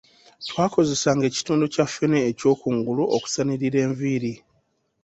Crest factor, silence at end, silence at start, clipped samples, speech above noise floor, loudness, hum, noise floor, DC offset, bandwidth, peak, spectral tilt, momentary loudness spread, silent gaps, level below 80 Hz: 18 dB; 0.7 s; 0.4 s; under 0.1%; 46 dB; -23 LUFS; none; -68 dBFS; under 0.1%; 8.2 kHz; -4 dBFS; -5 dB/octave; 6 LU; none; -60 dBFS